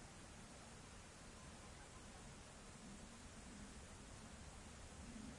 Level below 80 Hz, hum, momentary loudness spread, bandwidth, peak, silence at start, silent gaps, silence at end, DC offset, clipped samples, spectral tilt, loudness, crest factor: -64 dBFS; none; 2 LU; 11.5 kHz; -44 dBFS; 0 s; none; 0 s; under 0.1%; under 0.1%; -3.5 dB/octave; -58 LUFS; 14 dB